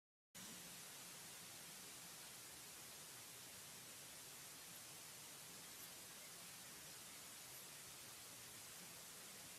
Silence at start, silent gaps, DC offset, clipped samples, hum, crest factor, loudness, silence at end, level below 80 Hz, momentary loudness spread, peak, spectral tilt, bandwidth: 0.35 s; none; under 0.1%; under 0.1%; none; 14 dB; -55 LUFS; 0 s; -86 dBFS; 1 LU; -44 dBFS; -1 dB/octave; 16 kHz